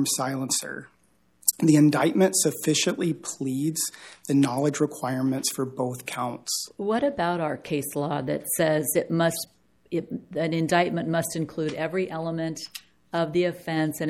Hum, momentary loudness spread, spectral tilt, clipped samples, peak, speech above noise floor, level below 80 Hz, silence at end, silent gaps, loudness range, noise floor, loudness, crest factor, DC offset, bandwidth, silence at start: none; 10 LU; -4.5 dB/octave; under 0.1%; -2 dBFS; 40 dB; -66 dBFS; 0 s; none; 5 LU; -65 dBFS; -25 LUFS; 24 dB; under 0.1%; 16.5 kHz; 0 s